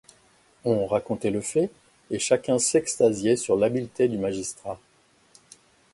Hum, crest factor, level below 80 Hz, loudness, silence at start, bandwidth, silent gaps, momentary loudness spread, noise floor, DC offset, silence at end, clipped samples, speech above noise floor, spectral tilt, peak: none; 20 dB; -60 dBFS; -25 LUFS; 0.65 s; 11.5 kHz; none; 11 LU; -60 dBFS; under 0.1%; 1.15 s; under 0.1%; 36 dB; -4.5 dB/octave; -6 dBFS